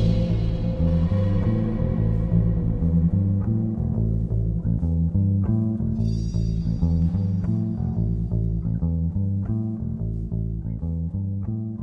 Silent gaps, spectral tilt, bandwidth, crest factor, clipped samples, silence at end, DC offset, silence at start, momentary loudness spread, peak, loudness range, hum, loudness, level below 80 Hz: none; -10.5 dB/octave; 6 kHz; 14 dB; under 0.1%; 0 s; under 0.1%; 0 s; 7 LU; -10 dBFS; 4 LU; none; -24 LUFS; -30 dBFS